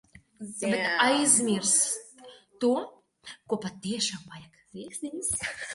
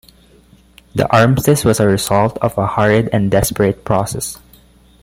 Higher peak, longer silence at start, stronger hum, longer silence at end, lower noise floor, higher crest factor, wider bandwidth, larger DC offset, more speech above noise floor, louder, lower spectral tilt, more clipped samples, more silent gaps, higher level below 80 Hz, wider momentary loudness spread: second, -6 dBFS vs 0 dBFS; second, 0.15 s vs 0.95 s; neither; second, 0 s vs 0.65 s; first, -52 dBFS vs -47 dBFS; first, 22 dB vs 16 dB; second, 12 kHz vs 16.5 kHz; neither; second, 24 dB vs 34 dB; second, -26 LUFS vs -15 LUFS; second, -2 dB/octave vs -5.5 dB/octave; neither; neither; second, -64 dBFS vs -38 dBFS; first, 23 LU vs 10 LU